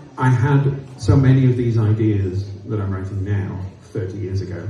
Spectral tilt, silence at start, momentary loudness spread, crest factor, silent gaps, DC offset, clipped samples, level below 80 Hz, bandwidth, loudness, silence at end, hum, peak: -8.5 dB/octave; 0 s; 13 LU; 16 dB; none; under 0.1%; under 0.1%; -42 dBFS; 10 kHz; -19 LUFS; 0 s; none; -2 dBFS